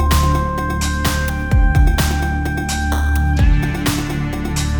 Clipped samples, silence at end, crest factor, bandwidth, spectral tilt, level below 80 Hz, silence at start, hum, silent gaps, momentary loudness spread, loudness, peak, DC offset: under 0.1%; 0 s; 14 dB; over 20 kHz; -5 dB/octave; -18 dBFS; 0 s; none; none; 5 LU; -18 LUFS; -2 dBFS; under 0.1%